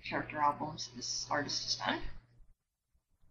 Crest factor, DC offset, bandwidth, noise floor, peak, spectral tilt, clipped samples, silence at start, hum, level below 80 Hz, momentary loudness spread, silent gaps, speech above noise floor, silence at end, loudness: 20 dB; under 0.1%; 8 kHz; -79 dBFS; -18 dBFS; -2.5 dB/octave; under 0.1%; 0 s; none; -54 dBFS; 7 LU; none; 42 dB; 0.8 s; -35 LUFS